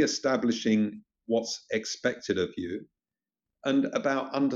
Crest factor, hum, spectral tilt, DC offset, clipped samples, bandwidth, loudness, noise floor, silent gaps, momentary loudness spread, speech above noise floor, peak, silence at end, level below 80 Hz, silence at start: 16 dB; none; -4 dB/octave; under 0.1%; under 0.1%; 7.8 kHz; -29 LUFS; under -90 dBFS; none; 10 LU; over 62 dB; -12 dBFS; 0 s; -70 dBFS; 0 s